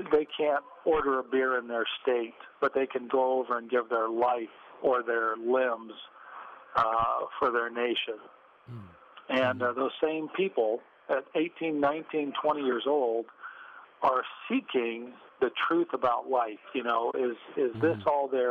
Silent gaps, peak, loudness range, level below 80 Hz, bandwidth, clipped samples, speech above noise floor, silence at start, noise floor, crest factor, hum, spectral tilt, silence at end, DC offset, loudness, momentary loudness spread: none; -14 dBFS; 2 LU; -66 dBFS; 6.2 kHz; under 0.1%; 21 dB; 0 s; -50 dBFS; 14 dB; none; -7 dB/octave; 0 s; under 0.1%; -29 LUFS; 14 LU